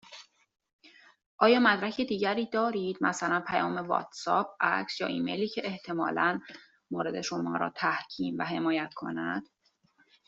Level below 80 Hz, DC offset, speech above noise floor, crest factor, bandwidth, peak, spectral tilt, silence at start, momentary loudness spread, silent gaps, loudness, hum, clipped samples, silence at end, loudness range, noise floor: -72 dBFS; under 0.1%; 39 dB; 24 dB; 8 kHz; -6 dBFS; -4.5 dB/octave; 0.1 s; 10 LU; 0.73-0.79 s, 1.26-1.38 s; -30 LUFS; none; under 0.1%; 0.85 s; 5 LU; -68 dBFS